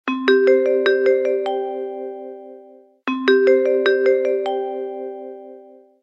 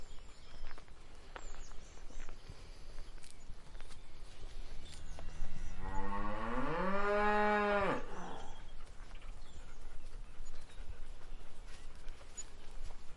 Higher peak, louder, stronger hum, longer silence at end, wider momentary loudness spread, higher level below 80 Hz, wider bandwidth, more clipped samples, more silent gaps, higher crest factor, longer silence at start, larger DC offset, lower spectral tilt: first, -2 dBFS vs -20 dBFS; first, -18 LUFS vs -38 LUFS; neither; first, 0.4 s vs 0 s; second, 20 LU vs 23 LU; second, -78 dBFS vs -44 dBFS; second, 6 kHz vs 10.5 kHz; neither; neither; about the same, 16 dB vs 16 dB; about the same, 0.05 s vs 0 s; neither; about the same, -4 dB/octave vs -5 dB/octave